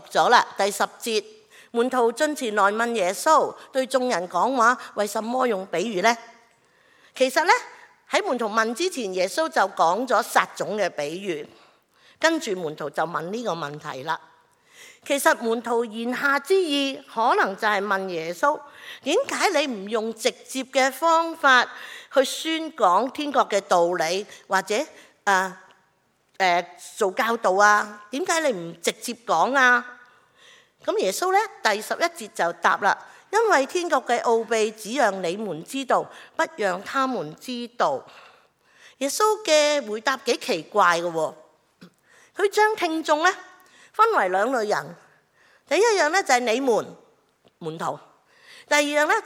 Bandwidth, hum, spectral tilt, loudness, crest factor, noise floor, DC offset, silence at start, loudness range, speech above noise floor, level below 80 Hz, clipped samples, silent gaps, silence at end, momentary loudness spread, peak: 17.5 kHz; none; -2.5 dB/octave; -23 LUFS; 22 dB; -66 dBFS; under 0.1%; 0.05 s; 4 LU; 43 dB; -82 dBFS; under 0.1%; none; 0 s; 12 LU; -2 dBFS